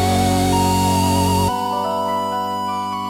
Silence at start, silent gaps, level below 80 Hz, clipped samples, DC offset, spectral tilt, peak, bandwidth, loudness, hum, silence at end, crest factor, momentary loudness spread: 0 s; none; -40 dBFS; under 0.1%; under 0.1%; -5 dB/octave; -4 dBFS; 17.5 kHz; -18 LUFS; none; 0 s; 14 dB; 6 LU